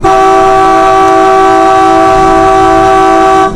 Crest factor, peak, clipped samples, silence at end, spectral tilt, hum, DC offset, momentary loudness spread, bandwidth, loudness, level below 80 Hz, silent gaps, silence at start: 4 dB; 0 dBFS; under 0.1%; 0 s; -5 dB/octave; none; under 0.1%; 0 LU; 13.5 kHz; -5 LUFS; -26 dBFS; none; 0 s